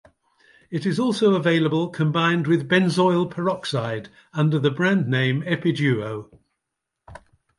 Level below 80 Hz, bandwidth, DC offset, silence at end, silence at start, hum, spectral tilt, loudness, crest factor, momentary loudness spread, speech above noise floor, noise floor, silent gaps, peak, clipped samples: -62 dBFS; 11.5 kHz; under 0.1%; 0.4 s; 0.7 s; none; -6.5 dB/octave; -21 LUFS; 18 dB; 9 LU; 61 dB; -82 dBFS; none; -4 dBFS; under 0.1%